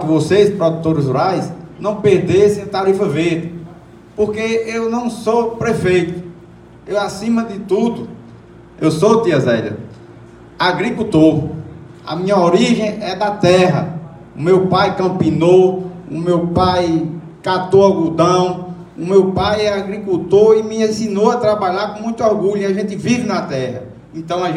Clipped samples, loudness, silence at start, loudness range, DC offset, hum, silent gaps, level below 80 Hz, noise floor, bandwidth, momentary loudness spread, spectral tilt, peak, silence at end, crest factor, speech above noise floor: under 0.1%; -15 LUFS; 0 s; 4 LU; under 0.1%; none; none; -46 dBFS; -40 dBFS; 11.5 kHz; 14 LU; -6.5 dB/octave; 0 dBFS; 0 s; 16 dB; 25 dB